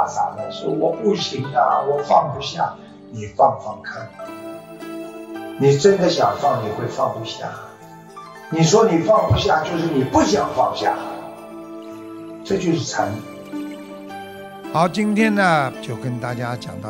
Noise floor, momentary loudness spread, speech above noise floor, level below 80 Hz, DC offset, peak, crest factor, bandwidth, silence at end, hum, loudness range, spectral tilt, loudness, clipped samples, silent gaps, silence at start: -40 dBFS; 19 LU; 21 dB; -50 dBFS; under 0.1%; -2 dBFS; 18 dB; 16.5 kHz; 0 s; none; 7 LU; -5.5 dB/octave; -19 LUFS; under 0.1%; none; 0 s